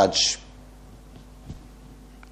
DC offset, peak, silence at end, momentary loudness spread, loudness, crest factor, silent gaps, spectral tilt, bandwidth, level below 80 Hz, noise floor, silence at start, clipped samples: under 0.1%; -6 dBFS; 0.35 s; 27 LU; -22 LUFS; 22 dB; none; -2 dB/octave; 15 kHz; -48 dBFS; -46 dBFS; 0 s; under 0.1%